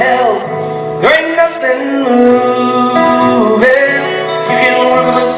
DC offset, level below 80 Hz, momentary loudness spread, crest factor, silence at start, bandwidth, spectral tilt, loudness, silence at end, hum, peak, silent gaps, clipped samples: under 0.1%; -50 dBFS; 7 LU; 10 dB; 0 s; 4 kHz; -8.5 dB/octave; -10 LUFS; 0 s; none; 0 dBFS; none; 0.4%